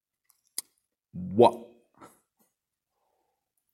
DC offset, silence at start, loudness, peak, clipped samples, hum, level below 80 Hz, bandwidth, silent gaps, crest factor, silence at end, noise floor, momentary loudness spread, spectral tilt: under 0.1%; 1.15 s; -26 LUFS; -6 dBFS; under 0.1%; none; -70 dBFS; 16 kHz; none; 26 dB; 2.1 s; -84 dBFS; 22 LU; -5.5 dB/octave